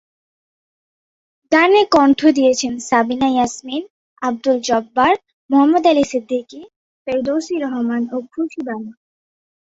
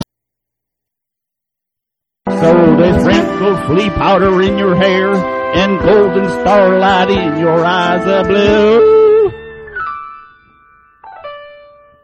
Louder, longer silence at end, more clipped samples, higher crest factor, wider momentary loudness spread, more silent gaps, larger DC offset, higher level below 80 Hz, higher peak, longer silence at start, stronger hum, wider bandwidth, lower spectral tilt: second, -17 LUFS vs -11 LUFS; first, 0.8 s vs 0.55 s; neither; about the same, 16 dB vs 12 dB; second, 14 LU vs 18 LU; first, 3.90-4.16 s, 5.33-5.49 s, 6.76-7.05 s vs none; neither; second, -58 dBFS vs -36 dBFS; about the same, 0 dBFS vs 0 dBFS; first, 1.5 s vs 0 s; neither; second, 8 kHz vs 10 kHz; second, -3.5 dB/octave vs -7 dB/octave